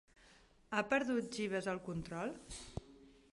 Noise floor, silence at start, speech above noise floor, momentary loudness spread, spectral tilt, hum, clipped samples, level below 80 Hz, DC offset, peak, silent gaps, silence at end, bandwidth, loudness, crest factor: -66 dBFS; 0.25 s; 27 dB; 15 LU; -5 dB/octave; none; under 0.1%; -62 dBFS; under 0.1%; -20 dBFS; none; 0.2 s; 11.5 kHz; -40 LUFS; 22 dB